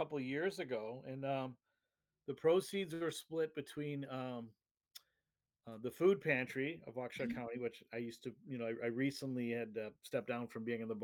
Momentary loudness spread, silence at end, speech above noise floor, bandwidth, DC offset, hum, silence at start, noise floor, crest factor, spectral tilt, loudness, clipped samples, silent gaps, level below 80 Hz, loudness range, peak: 15 LU; 0 s; over 50 dB; 18 kHz; under 0.1%; none; 0 s; under -90 dBFS; 22 dB; -6 dB/octave; -41 LUFS; under 0.1%; 4.71-4.75 s; -80 dBFS; 3 LU; -20 dBFS